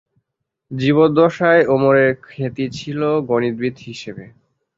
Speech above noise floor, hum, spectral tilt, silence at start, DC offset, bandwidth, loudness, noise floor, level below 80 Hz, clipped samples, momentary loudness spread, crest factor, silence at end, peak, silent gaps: 61 dB; none; -7 dB/octave; 0.7 s; under 0.1%; 7.6 kHz; -16 LUFS; -77 dBFS; -56 dBFS; under 0.1%; 18 LU; 16 dB; 0.5 s; -2 dBFS; none